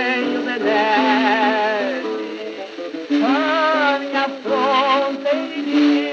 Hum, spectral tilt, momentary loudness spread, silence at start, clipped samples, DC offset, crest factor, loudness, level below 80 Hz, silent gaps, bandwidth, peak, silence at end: none; -4 dB/octave; 11 LU; 0 s; under 0.1%; under 0.1%; 14 dB; -18 LUFS; -82 dBFS; none; 7.2 kHz; -4 dBFS; 0 s